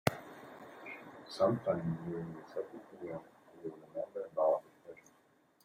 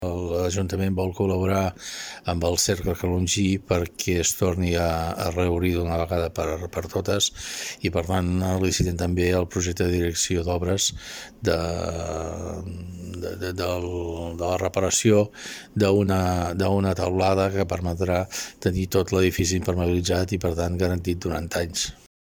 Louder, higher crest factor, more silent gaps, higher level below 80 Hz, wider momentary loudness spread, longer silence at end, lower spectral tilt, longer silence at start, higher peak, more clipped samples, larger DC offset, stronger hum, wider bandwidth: second, -38 LUFS vs -24 LUFS; first, 28 dB vs 18 dB; neither; second, -72 dBFS vs -42 dBFS; first, 19 LU vs 9 LU; first, 0.65 s vs 0.4 s; first, -6.5 dB/octave vs -4.5 dB/octave; about the same, 0.05 s vs 0 s; second, -12 dBFS vs -6 dBFS; neither; neither; neither; about the same, 16 kHz vs 17.5 kHz